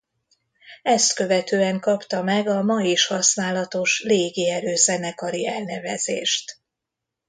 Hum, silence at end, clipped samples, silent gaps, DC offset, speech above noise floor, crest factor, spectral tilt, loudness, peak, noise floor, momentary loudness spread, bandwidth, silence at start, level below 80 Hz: none; 0.75 s; under 0.1%; none; under 0.1%; 62 dB; 20 dB; -2.5 dB/octave; -21 LUFS; -4 dBFS; -84 dBFS; 8 LU; 9.6 kHz; 0.65 s; -70 dBFS